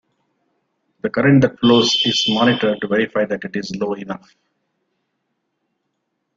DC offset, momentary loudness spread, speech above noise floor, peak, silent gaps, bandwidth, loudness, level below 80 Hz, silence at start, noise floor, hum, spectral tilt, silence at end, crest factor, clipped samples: under 0.1%; 13 LU; 56 dB; -2 dBFS; none; 7.6 kHz; -17 LUFS; -56 dBFS; 1.05 s; -73 dBFS; none; -5 dB/octave; 2.2 s; 18 dB; under 0.1%